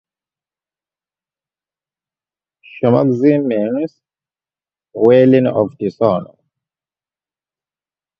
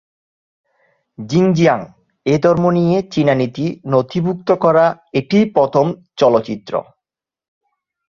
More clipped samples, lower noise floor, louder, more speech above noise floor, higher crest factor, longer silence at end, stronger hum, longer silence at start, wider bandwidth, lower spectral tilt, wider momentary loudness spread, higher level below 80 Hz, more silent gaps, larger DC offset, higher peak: neither; first, under -90 dBFS vs -85 dBFS; about the same, -14 LUFS vs -16 LUFS; first, over 77 dB vs 70 dB; about the same, 18 dB vs 16 dB; first, 1.95 s vs 1.25 s; neither; first, 2.75 s vs 1.2 s; second, 6 kHz vs 7.2 kHz; first, -10 dB/octave vs -7.5 dB/octave; about the same, 12 LU vs 10 LU; about the same, -58 dBFS vs -54 dBFS; neither; neither; about the same, 0 dBFS vs -2 dBFS